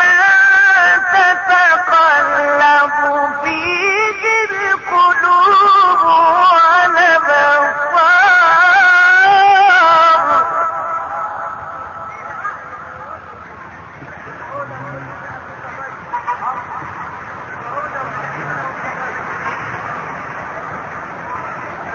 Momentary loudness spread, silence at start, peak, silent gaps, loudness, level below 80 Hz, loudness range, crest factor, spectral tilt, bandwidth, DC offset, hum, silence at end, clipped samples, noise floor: 20 LU; 0 s; -2 dBFS; none; -11 LUFS; -52 dBFS; 19 LU; 12 dB; -3 dB/octave; 7.4 kHz; under 0.1%; none; 0 s; under 0.1%; -34 dBFS